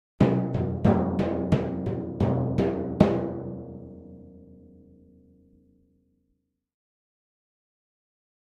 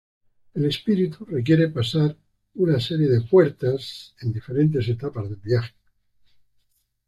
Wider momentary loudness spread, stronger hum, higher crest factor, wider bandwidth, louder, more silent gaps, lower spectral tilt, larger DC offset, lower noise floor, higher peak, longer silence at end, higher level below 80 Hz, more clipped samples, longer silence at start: first, 19 LU vs 13 LU; second, none vs 50 Hz at -50 dBFS; first, 24 dB vs 18 dB; second, 8 kHz vs 12 kHz; second, -26 LUFS vs -22 LUFS; neither; first, -9.5 dB/octave vs -8 dB/octave; neither; first, -75 dBFS vs -67 dBFS; about the same, -4 dBFS vs -4 dBFS; first, 4.1 s vs 1.4 s; first, -48 dBFS vs -58 dBFS; neither; second, 0.2 s vs 0.55 s